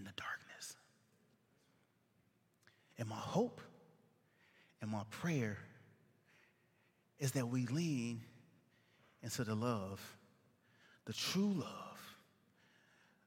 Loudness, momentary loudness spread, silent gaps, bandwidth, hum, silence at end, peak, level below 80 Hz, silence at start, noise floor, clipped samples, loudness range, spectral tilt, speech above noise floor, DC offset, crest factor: -42 LUFS; 18 LU; none; 16.5 kHz; none; 1.1 s; -22 dBFS; -82 dBFS; 0 s; -77 dBFS; under 0.1%; 5 LU; -5 dB/octave; 37 dB; under 0.1%; 22 dB